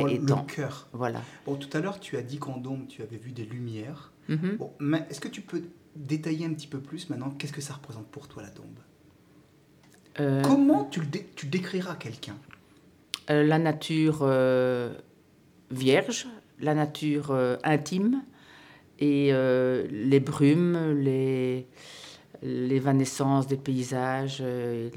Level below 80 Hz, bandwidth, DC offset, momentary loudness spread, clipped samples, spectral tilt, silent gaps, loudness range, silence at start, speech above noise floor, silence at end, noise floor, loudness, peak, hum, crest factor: -72 dBFS; 15.5 kHz; under 0.1%; 19 LU; under 0.1%; -6.5 dB/octave; none; 10 LU; 0 s; 32 dB; 0 s; -59 dBFS; -28 LUFS; -8 dBFS; none; 20 dB